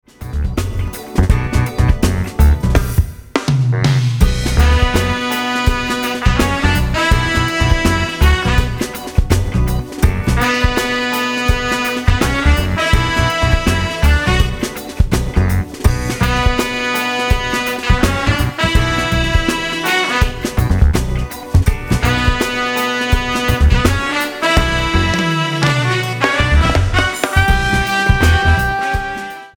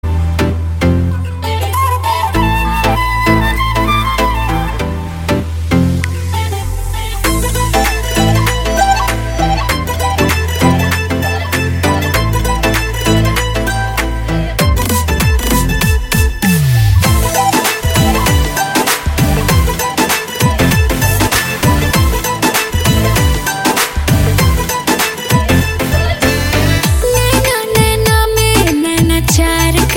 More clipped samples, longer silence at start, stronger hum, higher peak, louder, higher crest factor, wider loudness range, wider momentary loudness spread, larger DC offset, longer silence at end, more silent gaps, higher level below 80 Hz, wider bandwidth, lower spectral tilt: neither; first, 0.2 s vs 0.05 s; neither; about the same, 0 dBFS vs 0 dBFS; about the same, -15 LUFS vs -13 LUFS; about the same, 14 dB vs 12 dB; about the same, 2 LU vs 3 LU; about the same, 5 LU vs 5 LU; first, 0.2% vs under 0.1%; about the same, 0.1 s vs 0 s; neither; about the same, -18 dBFS vs -18 dBFS; first, over 20 kHz vs 17 kHz; about the same, -5 dB/octave vs -4.5 dB/octave